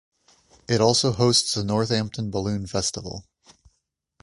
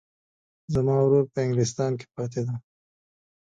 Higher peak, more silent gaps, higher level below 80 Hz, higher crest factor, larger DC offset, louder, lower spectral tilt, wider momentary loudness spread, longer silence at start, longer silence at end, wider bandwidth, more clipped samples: first, -4 dBFS vs -10 dBFS; neither; first, -50 dBFS vs -56 dBFS; about the same, 20 dB vs 18 dB; neither; first, -22 LUFS vs -25 LUFS; second, -4 dB/octave vs -7 dB/octave; about the same, 11 LU vs 11 LU; about the same, 0.7 s vs 0.7 s; about the same, 1 s vs 1 s; first, 11.5 kHz vs 9.2 kHz; neither